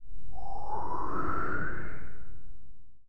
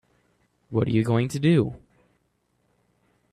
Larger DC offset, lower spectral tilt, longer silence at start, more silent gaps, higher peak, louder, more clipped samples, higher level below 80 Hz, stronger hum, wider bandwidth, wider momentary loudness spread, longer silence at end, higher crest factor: first, 6% vs under 0.1%; about the same, -8.5 dB/octave vs -7.5 dB/octave; second, 0 s vs 0.7 s; neither; second, -16 dBFS vs -8 dBFS; second, -36 LUFS vs -23 LUFS; neither; first, -46 dBFS vs -56 dBFS; second, none vs 60 Hz at -45 dBFS; second, 9.4 kHz vs 13.5 kHz; first, 21 LU vs 10 LU; second, 0 s vs 1.55 s; second, 12 dB vs 18 dB